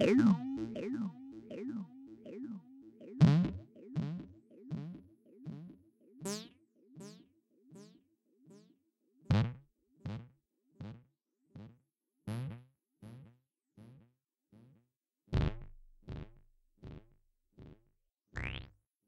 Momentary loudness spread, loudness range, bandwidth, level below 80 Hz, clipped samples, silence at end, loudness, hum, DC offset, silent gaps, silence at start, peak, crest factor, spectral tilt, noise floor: 26 LU; 15 LU; 12.5 kHz; -54 dBFS; under 0.1%; 0.4 s; -37 LUFS; none; under 0.1%; 14.97-15.01 s; 0 s; -12 dBFS; 26 dB; -7.5 dB/octave; -80 dBFS